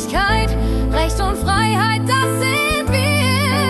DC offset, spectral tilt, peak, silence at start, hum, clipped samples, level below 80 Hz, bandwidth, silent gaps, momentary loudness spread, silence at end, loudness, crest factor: under 0.1%; -4.5 dB/octave; -4 dBFS; 0 s; none; under 0.1%; -24 dBFS; 13 kHz; none; 4 LU; 0 s; -17 LUFS; 12 dB